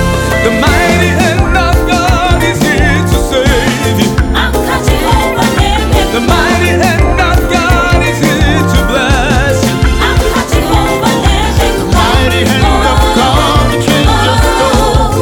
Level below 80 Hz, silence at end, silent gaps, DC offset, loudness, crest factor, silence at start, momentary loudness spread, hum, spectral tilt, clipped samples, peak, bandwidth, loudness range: -14 dBFS; 0 s; none; under 0.1%; -9 LUFS; 8 dB; 0 s; 2 LU; none; -5 dB/octave; under 0.1%; 0 dBFS; 18.5 kHz; 1 LU